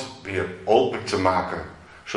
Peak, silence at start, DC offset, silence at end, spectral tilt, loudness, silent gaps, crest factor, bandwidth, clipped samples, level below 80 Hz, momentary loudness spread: -4 dBFS; 0 s; under 0.1%; 0 s; -5 dB/octave; -24 LUFS; none; 20 dB; 11.5 kHz; under 0.1%; -56 dBFS; 15 LU